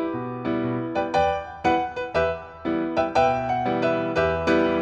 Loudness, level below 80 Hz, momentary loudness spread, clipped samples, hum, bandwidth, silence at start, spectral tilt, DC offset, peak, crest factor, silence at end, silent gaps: -24 LUFS; -46 dBFS; 6 LU; under 0.1%; none; 8.6 kHz; 0 s; -6.5 dB/octave; under 0.1%; -6 dBFS; 16 dB; 0 s; none